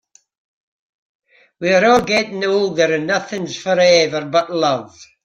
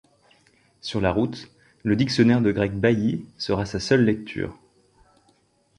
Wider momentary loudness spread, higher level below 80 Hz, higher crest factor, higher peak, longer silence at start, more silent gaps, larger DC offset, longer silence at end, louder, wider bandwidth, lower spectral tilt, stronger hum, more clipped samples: second, 10 LU vs 13 LU; second, -56 dBFS vs -48 dBFS; about the same, 16 dB vs 20 dB; first, 0 dBFS vs -4 dBFS; first, 1.6 s vs 0.85 s; neither; neither; second, 0.2 s vs 1.25 s; first, -16 LUFS vs -23 LUFS; about the same, 9.6 kHz vs 10.5 kHz; second, -4 dB/octave vs -6.5 dB/octave; neither; neither